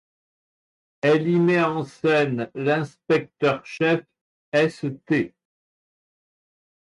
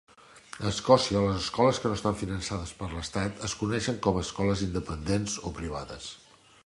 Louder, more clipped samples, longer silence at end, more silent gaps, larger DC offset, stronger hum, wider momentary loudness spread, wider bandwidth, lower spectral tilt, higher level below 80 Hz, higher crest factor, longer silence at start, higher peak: first, -23 LUFS vs -29 LUFS; neither; first, 1.55 s vs 0.5 s; first, 4.21-4.52 s vs none; neither; neither; second, 6 LU vs 14 LU; about the same, 11.5 kHz vs 11.5 kHz; first, -7 dB/octave vs -5 dB/octave; second, -68 dBFS vs -46 dBFS; second, 14 dB vs 24 dB; first, 1.05 s vs 0.35 s; second, -10 dBFS vs -6 dBFS